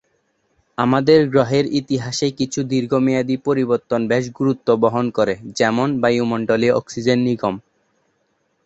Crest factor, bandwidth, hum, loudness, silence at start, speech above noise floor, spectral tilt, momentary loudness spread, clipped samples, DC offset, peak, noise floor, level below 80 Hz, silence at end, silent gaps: 18 dB; 8.2 kHz; none; -18 LUFS; 0.8 s; 49 dB; -6 dB/octave; 7 LU; under 0.1%; under 0.1%; -2 dBFS; -66 dBFS; -56 dBFS; 1.05 s; none